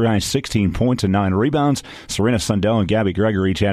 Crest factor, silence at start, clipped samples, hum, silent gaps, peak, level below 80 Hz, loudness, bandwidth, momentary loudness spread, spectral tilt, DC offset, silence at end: 14 dB; 0 s; under 0.1%; none; none; -4 dBFS; -38 dBFS; -19 LUFS; 14.5 kHz; 3 LU; -6 dB/octave; under 0.1%; 0 s